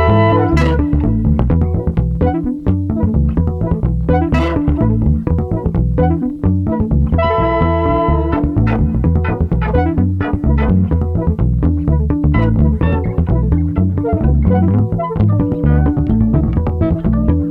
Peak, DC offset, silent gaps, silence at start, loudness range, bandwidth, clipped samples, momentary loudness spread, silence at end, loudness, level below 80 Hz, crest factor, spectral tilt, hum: -2 dBFS; under 0.1%; none; 0 s; 1 LU; 5.6 kHz; under 0.1%; 4 LU; 0 s; -15 LUFS; -20 dBFS; 12 dB; -10 dB/octave; none